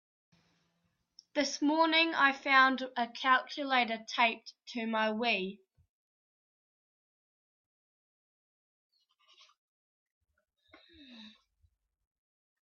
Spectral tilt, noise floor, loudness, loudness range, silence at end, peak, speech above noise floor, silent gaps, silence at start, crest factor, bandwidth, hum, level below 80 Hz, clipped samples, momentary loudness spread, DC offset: -2.5 dB/octave; -79 dBFS; -29 LUFS; 9 LU; 1.35 s; -12 dBFS; 49 dB; 5.89-8.90 s, 9.58-10.21 s; 1.35 s; 24 dB; 7.4 kHz; none; -84 dBFS; under 0.1%; 13 LU; under 0.1%